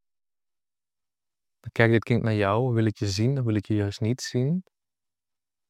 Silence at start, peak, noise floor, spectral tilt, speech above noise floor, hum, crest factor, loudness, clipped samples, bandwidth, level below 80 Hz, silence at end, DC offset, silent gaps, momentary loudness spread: 1.65 s; -4 dBFS; under -90 dBFS; -6.5 dB/octave; over 66 dB; none; 22 dB; -25 LUFS; under 0.1%; 12 kHz; -62 dBFS; 1.1 s; under 0.1%; none; 6 LU